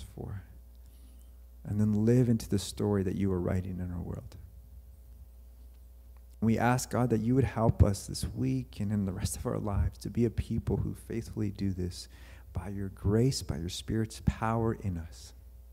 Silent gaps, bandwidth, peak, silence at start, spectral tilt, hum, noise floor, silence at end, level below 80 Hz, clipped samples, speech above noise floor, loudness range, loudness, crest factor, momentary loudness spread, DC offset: none; 16 kHz; -10 dBFS; 0 s; -6.5 dB/octave; none; -52 dBFS; 0 s; -44 dBFS; under 0.1%; 21 dB; 5 LU; -31 LUFS; 22 dB; 16 LU; under 0.1%